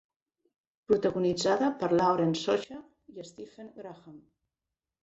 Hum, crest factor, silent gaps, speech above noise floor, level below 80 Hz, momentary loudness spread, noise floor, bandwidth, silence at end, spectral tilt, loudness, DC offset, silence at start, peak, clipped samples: none; 20 dB; none; 61 dB; -68 dBFS; 20 LU; -90 dBFS; 8.2 kHz; 0.85 s; -5.5 dB/octave; -28 LUFS; under 0.1%; 0.9 s; -12 dBFS; under 0.1%